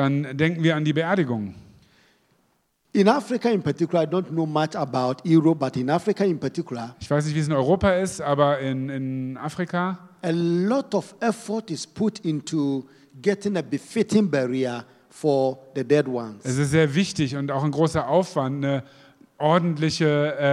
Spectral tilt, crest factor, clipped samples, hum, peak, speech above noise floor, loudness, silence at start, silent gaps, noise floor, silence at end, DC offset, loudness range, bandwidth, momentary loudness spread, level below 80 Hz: -6.5 dB/octave; 22 dB; under 0.1%; none; -2 dBFS; 45 dB; -23 LUFS; 0 s; none; -68 dBFS; 0 s; under 0.1%; 3 LU; 12.5 kHz; 9 LU; -54 dBFS